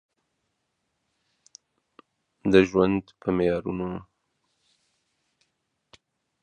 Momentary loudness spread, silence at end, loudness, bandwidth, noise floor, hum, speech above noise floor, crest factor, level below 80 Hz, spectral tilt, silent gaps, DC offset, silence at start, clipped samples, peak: 13 LU; 2.4 s; -24 LUFS; 9 kHz; -78 dBFS; none; 55 dB; 26 dB; -54 dBFS; -7 dB/octave; none; under 0.1%; 2.45 s; under 0.1%; -4 dBFS